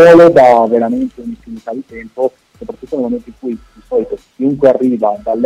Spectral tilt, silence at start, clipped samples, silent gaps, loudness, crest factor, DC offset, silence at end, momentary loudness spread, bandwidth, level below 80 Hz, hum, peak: -7 dB/octave; 0 s; 1%; none; -12 LUFS; 12 dB; under 0.1%; 0 s; 21 LU; 9.6 kHz; -46 dBFS; none; 0 dBFS